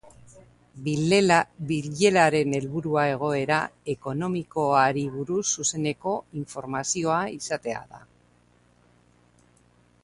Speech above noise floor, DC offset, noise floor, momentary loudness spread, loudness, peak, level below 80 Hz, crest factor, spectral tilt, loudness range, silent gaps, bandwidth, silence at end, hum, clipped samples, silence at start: 36 dB; under 0.1%; -61 dBFS; 12 LU; -25 LUFS; -6 dBFS; -60 dBFS; 20 dB; -4.5 dB/octave; 8 LU; none; 11.5 kHz; 2.05 s; 60 Hz at -50 dBFS; under 0.1%; 0.35 s